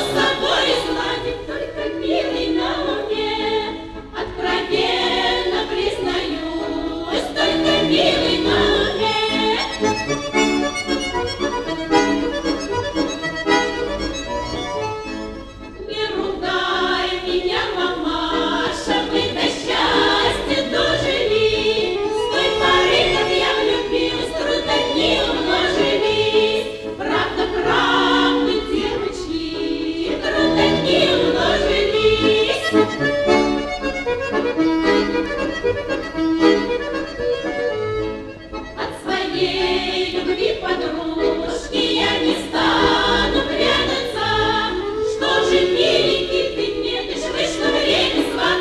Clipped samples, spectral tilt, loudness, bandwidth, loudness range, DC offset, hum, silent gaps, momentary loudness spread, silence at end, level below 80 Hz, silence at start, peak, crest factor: under 0.1%; -4 dB/octave; -19 LUFS; 12.5 kHz; 5 LU; under 0.1%; none; none; 9 LU; 0 s; -38 dBFS; 0 s; -2 dBFS; 18 dB